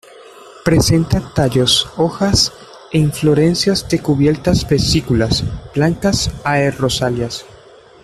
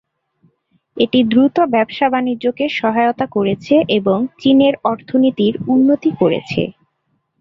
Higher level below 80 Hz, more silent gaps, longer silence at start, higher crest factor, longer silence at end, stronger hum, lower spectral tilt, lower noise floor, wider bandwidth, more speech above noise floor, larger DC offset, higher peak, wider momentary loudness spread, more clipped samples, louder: first, -34 dBFS vs -54 dBFS; neither; second, 0.2 s vs 0.95 s; about the same, 14 dB vs 14 dB; about the same, 0.6 s vs 0.7 s; neither; second, -5 dB/octave vs -7.5 dB/octave; second, -42 dBFS vs -67 dBFS; first, 14.5 kHz vs 6.2 kHz; second, 27 dB vs 53 dB; neither; about the same, -2 dBFS vs -2 dBFS; about the same, 6 LU vs 7 LU; neither; about the same, -15 LUFS vs -15 LUFS